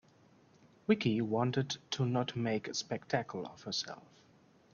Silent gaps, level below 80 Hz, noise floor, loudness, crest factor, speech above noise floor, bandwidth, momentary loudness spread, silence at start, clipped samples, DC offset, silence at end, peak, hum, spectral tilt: none; -72 dBFS; -65 dBFS; -35 LUFS; 20 dB; 30 dB; 7.2 kHz; 12 LU; 0.9 s; under 0.1%; under 0.1%; 0.75 s; -16 dBFS; none; -5 dB/octave